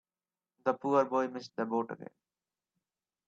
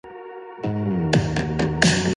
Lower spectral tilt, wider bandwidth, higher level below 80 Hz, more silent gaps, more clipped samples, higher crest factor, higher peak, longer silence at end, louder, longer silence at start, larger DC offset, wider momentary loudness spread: first, -6.5 dB/octave vs -5 dB/octave; second, 7.6 kHz vs 11.5 kHz; second, -82 dBFS vs -40 dBFS; neither; neither; about the same, 22 dB vs 22 dB; second, -14 dBFS vs 0 dBFS; first, 1.2 s vs 0 s; second, -33 LUFS vs -22 LUFS; first, 0.65 s vs 0.05 s; neither; second, 15 LU vs 19 LU